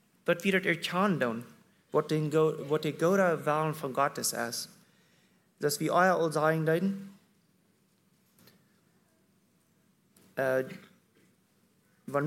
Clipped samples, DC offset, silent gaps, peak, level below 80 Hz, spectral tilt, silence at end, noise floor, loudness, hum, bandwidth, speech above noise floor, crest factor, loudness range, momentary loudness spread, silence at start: under 0.1%; under 0.1%; none; -10 dBFS; -80 dBFS; -5 dB/octave; 0 s; -69 dBFS; -29 LUFS; none; 16.5 kHz; 41 dB; 20 dB; 10 LU; 15 LU; 0.25 s